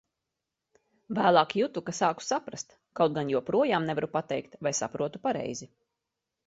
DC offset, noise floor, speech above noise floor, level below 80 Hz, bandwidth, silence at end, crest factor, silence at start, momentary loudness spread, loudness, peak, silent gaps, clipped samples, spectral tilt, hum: under 0.1%; -86 dBFS; 58 dB; -70 dBFS; 8 kHz; 0.8 s; 24 dB; 1.1 s; 13 LU; -29 LUFS; -6 dBFS; none; under 0.1%; -4.5 dB/octave; none